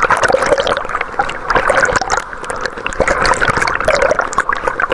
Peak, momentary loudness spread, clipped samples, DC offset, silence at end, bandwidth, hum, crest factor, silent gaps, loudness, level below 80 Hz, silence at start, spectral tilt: 0 dBFS; 8 LU; under 0.1%; under 0.1%; 0 s; 11.5 kHz; none; 14 dB; none; -14 LUFS; -32 dBFS; 0 s; -3 dB/octave